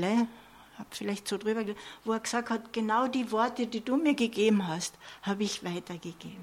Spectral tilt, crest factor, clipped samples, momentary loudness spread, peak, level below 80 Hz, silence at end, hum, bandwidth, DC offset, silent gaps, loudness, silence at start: -4.5 dB/octave; 18 dB; under 0.1%; 12 LU; -14 dBFS; -70 dBFS; 0 s; none; 16 kHz; under 0.1%; none; -31 LUFS; 0 s